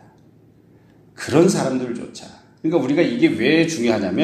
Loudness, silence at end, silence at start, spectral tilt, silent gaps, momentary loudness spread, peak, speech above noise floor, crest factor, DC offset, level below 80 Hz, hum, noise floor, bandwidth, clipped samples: -18 LUFS; 0 s; 1.2 s; -5.5 dB/octave; none; 15 LU; 0 dBFS; 33 dB; 20 dB; under 0.1%; -60 dBFS; none; -51 dBFS; 13 kHz; under 0.1%